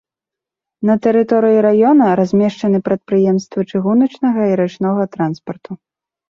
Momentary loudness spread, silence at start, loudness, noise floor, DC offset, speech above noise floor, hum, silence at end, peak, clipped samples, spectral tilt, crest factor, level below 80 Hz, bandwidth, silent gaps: 10 LU; 0.8 s; -14 LUFS; -86 dBFS; under 0.1%; 72 dB; none; 0.55 s; -2 dBFS; under 0.1%; -8.5 dB/octave; 12 dB; -58 dBFS; 7.2 kHz; none